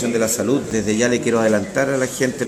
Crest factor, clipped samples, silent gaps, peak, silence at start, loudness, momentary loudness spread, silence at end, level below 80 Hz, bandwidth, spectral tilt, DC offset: 16 dB; under 0.1%; none; -4 dBFS; 0 s; -19 LUFS; 3 LU; 0 s; -50 dBFS; 15 kHz; -4.5 dB/octave; under 0.1%